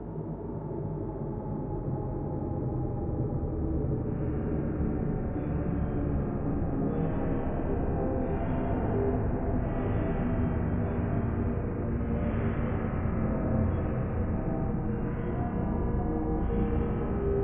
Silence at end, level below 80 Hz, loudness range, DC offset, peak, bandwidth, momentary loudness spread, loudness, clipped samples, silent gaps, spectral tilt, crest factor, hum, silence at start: 0 s; -36 dBFS; 2 LU; under 0.1%; -16 dBFS; 3.5 kHz; 4 LU; -31 LUFS; under 0.1%; none; -13 dB/octave; 14 dB; none; 0 s